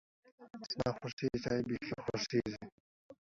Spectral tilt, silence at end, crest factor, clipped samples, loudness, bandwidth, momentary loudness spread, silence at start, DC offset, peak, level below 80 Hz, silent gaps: -5 dB/octave; 0.1 s; 20 dB; under 0.1%; -38 LUFS; 7.6 kHz; 15 LU; 0.4 s; under 0.1%; -20 dBFS; -62 dBFS; 1.13-1.17 s, 2.72-3.09 s